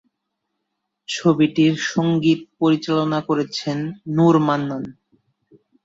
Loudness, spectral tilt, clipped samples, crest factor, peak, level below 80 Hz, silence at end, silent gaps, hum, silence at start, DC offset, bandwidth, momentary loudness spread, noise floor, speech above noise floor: -19 LUFS; -6 dB/octave; under 0.1%; 16 dB; -4 dBFS; -62 dBFS; 0.9 s; none; none; 1.1 s; under 0.1%; 7.8 kHz; 11 LU; -77 dBFS; 59 dB